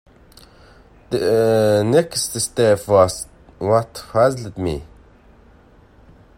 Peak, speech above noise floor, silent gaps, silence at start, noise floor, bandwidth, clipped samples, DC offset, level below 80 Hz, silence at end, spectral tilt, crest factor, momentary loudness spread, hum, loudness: 0 dBFS; 32 dB; none; 1.1 s; -49 dBFS; 16.5 kHz; under 0.1%; under 0.1%; -48 dBFS; 1.55 s; -5 dB/octave; 20 dB; 11 LU; none; -18 LUFS